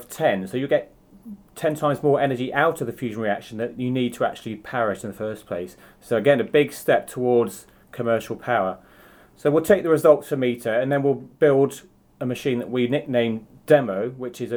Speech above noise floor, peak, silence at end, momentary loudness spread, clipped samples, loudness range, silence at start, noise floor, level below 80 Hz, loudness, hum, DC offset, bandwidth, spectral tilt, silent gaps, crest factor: 29 dB; -2 dBFS; 0 s; 13 LU; under 0.1%; 4 LU; 0 s; -51 dBFS; -60 dBFS; -22 LUFS; none; under 0.1%; over 20 kHz; -6 dB/octave; none; 20 dB